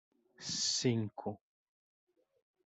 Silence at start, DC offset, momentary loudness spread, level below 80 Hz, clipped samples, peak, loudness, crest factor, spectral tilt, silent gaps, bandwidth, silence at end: 0.4 s; under 0.1%; 15 LU; -76 dBFS; under 0.1%; -18 dBFS; -35 LUFS; 22 dB; -3.5 dB/octave; none; 8.2 kHz; 1.3 s